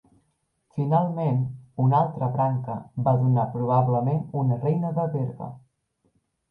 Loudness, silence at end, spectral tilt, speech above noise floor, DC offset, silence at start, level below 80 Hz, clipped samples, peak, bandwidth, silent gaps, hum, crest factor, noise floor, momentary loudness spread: -24 LUFS; 0.9 s; -12 dB/octave; 49 dB; under 0.1%; 0.75 s; -62 dBFS; under 0.1%; -8 dBFS; 3.9 kHz; none; none; 16 dB; -72 dBFS; 10 LU